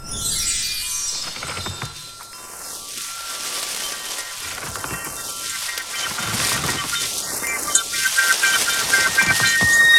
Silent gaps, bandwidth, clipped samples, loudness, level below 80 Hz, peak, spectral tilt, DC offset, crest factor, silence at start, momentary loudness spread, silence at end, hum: none; 18 kHz; under 0.1%; -20 LUFS; -46 dBFS; 0 dBFS; 0 dB/octave; under 0.1%; 22 dB; 0 s; 14 LU; 0 s; none